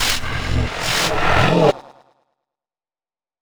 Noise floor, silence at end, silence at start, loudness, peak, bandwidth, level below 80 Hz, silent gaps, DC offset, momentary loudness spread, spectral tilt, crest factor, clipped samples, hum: under -90 dBFS; 1.55 s; 0 s; -18 LUFS; -2 dBFS; over 20 kHz; -30 dBFS; none; under 0.1%; 7 LU; -4 dB/octave; 18 dB; under 0.1%; none